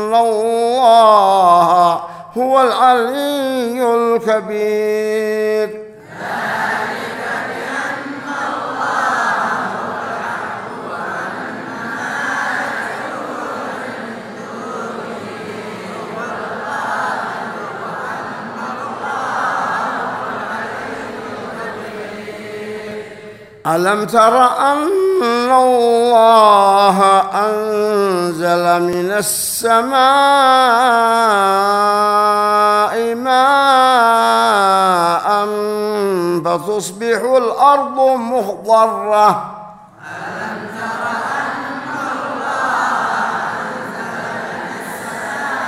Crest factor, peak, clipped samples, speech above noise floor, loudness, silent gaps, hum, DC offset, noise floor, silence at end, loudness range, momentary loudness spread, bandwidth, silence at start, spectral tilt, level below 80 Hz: 16 dB; 0 dBFS; under 0.1%; 23 dB; -15 LUFS; none; none; under 0.1%; -36 dBFS; 0 s; 12 LU; 16 LU; 16 kHz; 0 s; -3.5 dB/octave; -60 dBFS